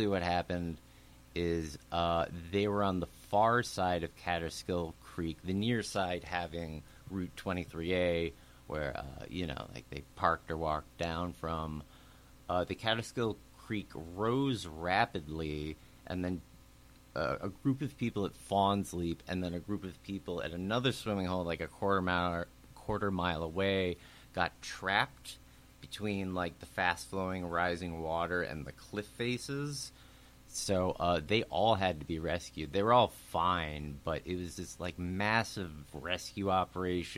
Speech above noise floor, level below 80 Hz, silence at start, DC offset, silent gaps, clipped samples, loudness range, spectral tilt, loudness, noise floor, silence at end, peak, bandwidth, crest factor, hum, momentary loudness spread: 24 dB; -54 dBFS; 0 s; under 0.1%; none; under 0.1%; 5 LU; -5 dB/octave; -35 LUFS; -59 dBFS; 0 s; -12 dBFS; 16.5 kHz; 24 dB; none; 12 LU